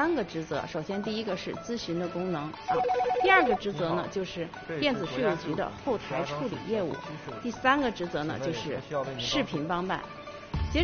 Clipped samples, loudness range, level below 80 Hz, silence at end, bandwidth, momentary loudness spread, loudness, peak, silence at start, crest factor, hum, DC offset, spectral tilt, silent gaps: under 0.1%; 4 LU; -48 dBFS; 0 s; 6.8 kHz; 10 LU; -30 LUFS; -8 dBFS; 0 s; 22 dB; none; under 0.1%; -3.5 dB/octave; none